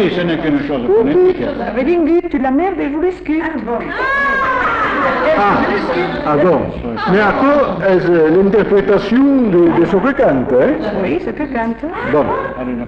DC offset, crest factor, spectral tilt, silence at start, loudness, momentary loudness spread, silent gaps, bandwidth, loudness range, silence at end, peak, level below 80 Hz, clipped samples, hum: under 0.1%; 10 dB; -8 dB/octave; 0 s; -14 LUFS; 8 LU; none; 7 kHz; 3 LU; 0 s; -4 dBFS; -38 dBFS; under 0.1%; none